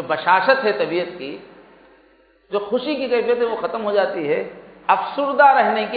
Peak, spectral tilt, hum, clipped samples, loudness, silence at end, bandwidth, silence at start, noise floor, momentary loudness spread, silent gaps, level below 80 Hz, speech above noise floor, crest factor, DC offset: -2 dBFS; -9 dB/octave; none; under 0.1%; -19 LUFS; 0 s; 5 kHz; 0 s; -55 dBFS; 15 LU; none; -64 dBFS; 36 dB; 18 dB; under 0.1%